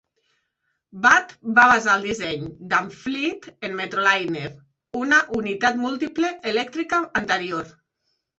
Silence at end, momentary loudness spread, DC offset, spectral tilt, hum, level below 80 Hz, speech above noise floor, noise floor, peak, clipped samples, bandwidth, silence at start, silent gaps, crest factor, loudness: 0.7 s; 15 LU; under 0.1%; -3.5 dB/octave; none; -58 dBFS; 53 dB; -75 dBFS; -2 dBFS; under 0.1%; 8.2 kHz; 0.95 s; none; 20 dB; -21 LUFS